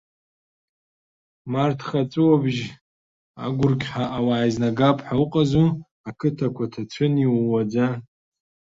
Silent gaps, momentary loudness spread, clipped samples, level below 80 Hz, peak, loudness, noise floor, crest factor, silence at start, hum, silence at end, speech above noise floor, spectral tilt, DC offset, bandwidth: 2.81-3.34 s, 5.91-6.04 s; 11 LU; under 0.1%; -54 dBFS; -4 dBFS; -22 LUFS; under -90 dBFS; 18 dB; 1.45 s; none; 0.7 s; over 69 dB; -8 dB/octave; under 0.1%; 7.8 kHz